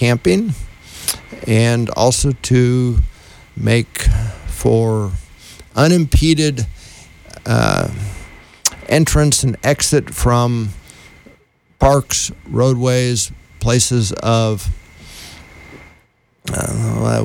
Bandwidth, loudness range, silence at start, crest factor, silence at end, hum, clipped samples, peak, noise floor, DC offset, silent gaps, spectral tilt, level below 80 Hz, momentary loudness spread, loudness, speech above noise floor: 19.5 kHz; 3 LU; 0 s; 14 dB; 0 s; none; under 0.1%; -2 dBFS; -55 dBFS; under 0.1%; none; -5 dB/octave; -26 dBFS; 14 LU; -16 LUFS; 41 dB